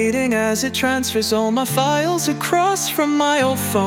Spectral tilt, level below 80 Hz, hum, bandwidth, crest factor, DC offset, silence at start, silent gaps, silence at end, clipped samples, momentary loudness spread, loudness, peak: -3.5 dB/octave; -56 dBFS; none; 18 kHz; 14 dB; under 0.1%; 0 s; none; 0 s; under 0.1%; 2 LU; -18 LUFS; -4 dBFS